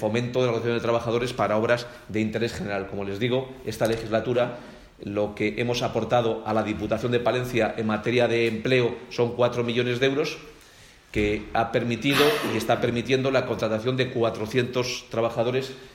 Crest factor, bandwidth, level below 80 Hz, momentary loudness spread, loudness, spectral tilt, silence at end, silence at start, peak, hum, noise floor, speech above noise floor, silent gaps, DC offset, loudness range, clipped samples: 18 dB; 17 kHz; -50 dBFS; 6 LU; -25 LUFS; -5.5 dB/octave; 0 s; 0 s; -6 dBFS; none; -51 dBFS; 26 dB; none; under 0.1%; 3 LU; under 0.1%